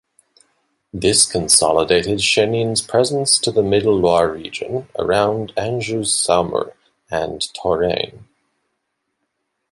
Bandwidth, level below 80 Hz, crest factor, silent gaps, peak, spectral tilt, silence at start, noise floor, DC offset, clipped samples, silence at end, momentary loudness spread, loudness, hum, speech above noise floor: 12 kHz; -46 dBFS; 18 dB; none; 0 dBFS; -3 dB/octave; 0.95 s; -74 dBFS; under 0.1%; under 0.1%; 1.5 s; 11 LU; -17 LUFS; none; 56 dB